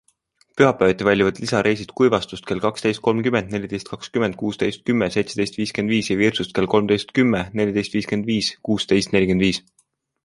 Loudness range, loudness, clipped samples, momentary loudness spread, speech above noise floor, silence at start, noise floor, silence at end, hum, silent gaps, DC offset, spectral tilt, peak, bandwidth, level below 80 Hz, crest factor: 3 LU; -20 LUFS; under 0.1%; 6 LU; 42 dB; 0.55 s; -62 dBFS; 0.65 s; none; none; under 0.1%; -5.5 dB/octave; -2 dBFS; 11.5 kHz; -50 dBFS; 18 dB